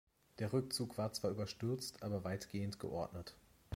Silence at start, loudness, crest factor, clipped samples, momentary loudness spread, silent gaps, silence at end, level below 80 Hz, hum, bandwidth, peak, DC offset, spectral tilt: 0.35 s; -42 LUFS; 18 dB; under 0.1%; 6 LU; none; 0 s; -68 dBFS; none; 16.5 kHz; -24 dBFS; under 0.1%; -5.5 dB/octave